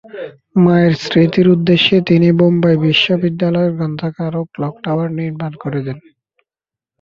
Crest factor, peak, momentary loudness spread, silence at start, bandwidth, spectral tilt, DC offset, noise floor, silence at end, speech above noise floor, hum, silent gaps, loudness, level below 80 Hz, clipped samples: 14 dB; 0 dBFS; 12 LU; 0.15 s; 7 kHz; -7.5 dB/octave; under 0.1%; -89 dBFS; 1 s; 75 dB; none; none; -14 LUFS; -52 dBFS; under 0.1%